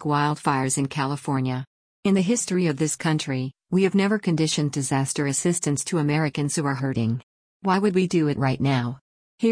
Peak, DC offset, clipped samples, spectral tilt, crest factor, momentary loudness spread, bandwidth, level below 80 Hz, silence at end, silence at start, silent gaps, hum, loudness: -8 dBFS; under 0.1%; under 0.1%; -5 dB/octave; 16 dB; 7 LU; 10.5 kHz; -58 dBFS; 0 s; 0 s; 1.67-2.03 s, 7.23-7.60 s, 9.01-9.38 s; none; -24 LUFS